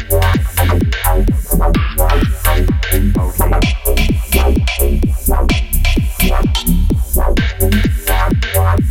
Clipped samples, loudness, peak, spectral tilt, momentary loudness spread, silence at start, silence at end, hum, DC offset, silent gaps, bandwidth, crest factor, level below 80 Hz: under 0.1%; -15 LUFS; 0 dBFS; -5 dB/octave; 2 LU; 0 s; 0 s; none; under 0.1%; none; 17 kHz; 12 dB; -14 dBFS